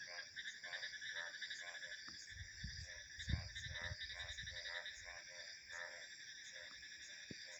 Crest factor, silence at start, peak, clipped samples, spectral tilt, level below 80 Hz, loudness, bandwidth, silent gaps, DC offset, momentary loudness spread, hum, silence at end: 24 dB; 0 s; -28 dBFS; under 0.1%; -2 dB/octave; -60 dBFS; -49 LUFS; over 20 kHz; none; under 0.1%; 6 LU; none; 0 s